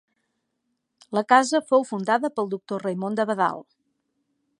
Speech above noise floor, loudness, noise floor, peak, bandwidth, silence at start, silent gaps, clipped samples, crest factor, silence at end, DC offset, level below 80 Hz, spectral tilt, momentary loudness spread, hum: 54 dB; -23 LUFS; -77 dBFS; -2 dBFS; 11 kHz; 1.1 s; none; under 0.1%; 22 dB; 0.95 s; under 0.1%; -78 dBFS; -4.5 dB/octave; 10 LU; none